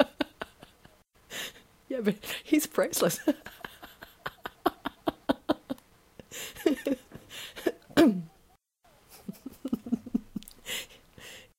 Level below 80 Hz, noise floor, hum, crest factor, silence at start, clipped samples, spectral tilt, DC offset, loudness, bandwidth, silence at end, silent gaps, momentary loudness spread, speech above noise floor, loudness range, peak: -62 dBFS; -64 dBFS; none; 24 dB; 0 s; under 0.1%; -4 dB/octave; under 0.1%; -31 LUFS; 16.5 kHz; 0.15 s; none; 18 LU; 36 dB; 5 LU; -8 dBFS